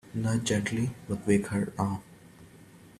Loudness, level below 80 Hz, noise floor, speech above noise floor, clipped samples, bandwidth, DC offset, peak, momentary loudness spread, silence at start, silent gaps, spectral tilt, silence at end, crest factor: -30 LUFS; -58 dBFS; -53 dBFS; 24 dB; under 0.1%; 14 kHz; under 0.1%; -10 dBFS; 6 LU; 0.1 s; none; -5.5 dB/octave; 0.1 s; 20 dB